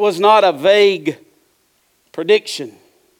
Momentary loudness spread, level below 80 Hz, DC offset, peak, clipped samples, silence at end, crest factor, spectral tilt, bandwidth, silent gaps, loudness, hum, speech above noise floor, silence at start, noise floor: 21 LU; -66 dBFS; under 0.1%; -2 dBFS; under 0.1%; 0.5 s; 14 dB; -4 dB/octave; 15 kHz; none; -14 LUFS; none; 47 dB; 0 s; -61 dBFS